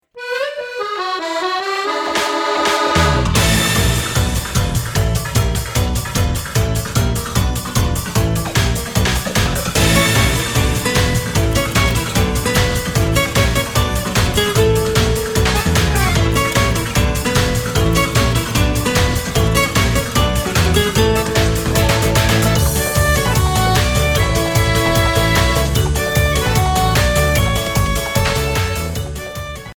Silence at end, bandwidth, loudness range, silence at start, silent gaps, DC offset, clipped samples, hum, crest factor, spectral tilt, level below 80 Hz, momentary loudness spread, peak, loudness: 0.05 s; over 20 kHz; 3 LU; 0.15 s; none; under 0.1%; under 0.1%; none; 14 dB; -4 dB/octave; -22 dBFS; 5 LU; 0 dBFS; -16 LUFS